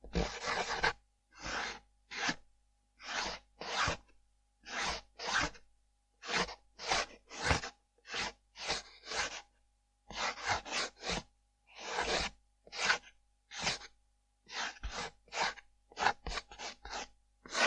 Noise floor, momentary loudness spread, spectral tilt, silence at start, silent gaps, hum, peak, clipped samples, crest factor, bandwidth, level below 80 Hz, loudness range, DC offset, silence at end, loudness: -74 dBFS; 13 LU; -2 dB/octave; 0.05 s; none; 50 Hz at -65 dBFS; -12 dBFS; under 0.1%; 26 dB; 11 kHz; -54 dBFS; 3 LU; under 0.1%; 0 s; -37 LUFS